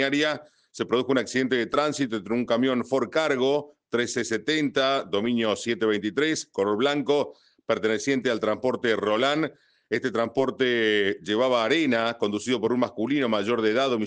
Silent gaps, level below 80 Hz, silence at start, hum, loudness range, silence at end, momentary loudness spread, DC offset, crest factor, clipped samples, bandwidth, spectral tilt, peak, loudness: none; -70 dBFS; 0 s; none; 1 LU; 0 s; 5 LU; under 0.1%; 16 dB; under 0.1%; 9.8 kHz; -4.5 dB/octave; -8 dBFS; -25 LUFS